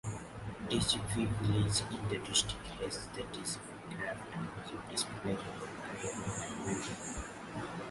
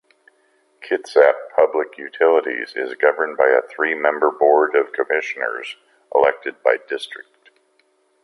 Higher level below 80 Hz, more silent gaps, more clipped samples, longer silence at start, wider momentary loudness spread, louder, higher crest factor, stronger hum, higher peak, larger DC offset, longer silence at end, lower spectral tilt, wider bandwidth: first, -54 dBFS vs -72 dBFS; neither; neither; second, 0.05 s vs 0.8 s; about the same, 12 LU vs 13 LU; second, -37 LUFS vs -19 LUFS; about the same, 22 dB vs 18 dB; neither; second, -16 dBFS vs 0 dBFS; neither; second, 0 s vs 1 s; about the same, -3.5 dB/octave vs -3.5 dB/octave; about the same, 11.5 kHz vs 11.5 kHz